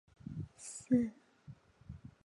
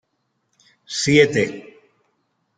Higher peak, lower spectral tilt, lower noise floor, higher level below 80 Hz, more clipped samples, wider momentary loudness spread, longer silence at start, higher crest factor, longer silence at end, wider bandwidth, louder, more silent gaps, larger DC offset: second, -18 dBFS vs -2 dBFS; first, -6.5 dB/octave vs -4.5 dB/octave; second, -58 dBFS vs -72 dBFS; second, -64 dBFS vs -58 dBFS; neither; first, 25 LU vs 15 LU; second, 0.25 s vs 0.9 s; about the same, 22 dB vs 20 dB; second, 0.15 s vs 0.95 s; first, 11.5 kHz vs 9.4 kHz; second, -38 LUFS vs -18 LUFS; neither; neither